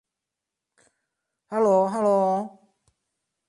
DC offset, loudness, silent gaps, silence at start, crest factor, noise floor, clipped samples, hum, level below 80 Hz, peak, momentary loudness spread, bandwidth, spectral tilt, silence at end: under 0.1%; -23 LUFS; none; 1.5 s; 18 dB; -86 dBFS; under 0.1%; none; -76 dBFS; -10 dBFS; 11 LU; 11.5 kHz; -7.5 dB/octave; 1 s